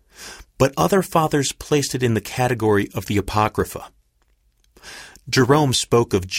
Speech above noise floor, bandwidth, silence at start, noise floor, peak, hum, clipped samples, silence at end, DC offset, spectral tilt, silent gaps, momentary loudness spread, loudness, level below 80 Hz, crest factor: 43 dB; 16.5 kHz; 0.2 s; -62 dBFS; -4 dBFS; none; under 0.1%; 0 s; under 0.1%; -5 dB/octave; none; 21 LU; -19 LUFS; -44 dBFS; 18 dB